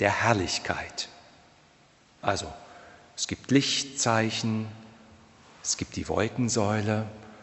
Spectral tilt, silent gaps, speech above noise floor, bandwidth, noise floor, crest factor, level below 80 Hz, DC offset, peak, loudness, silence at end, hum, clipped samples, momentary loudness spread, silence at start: -4 dB/octave; none; 32 dB; 8.4 kHz; -59 dBFS; 24 dB; -56 dBFS; under 0.1%; -6 dBFS; -28 LUFS; 0 s; none; under 0.1%; 15 LU; 0 s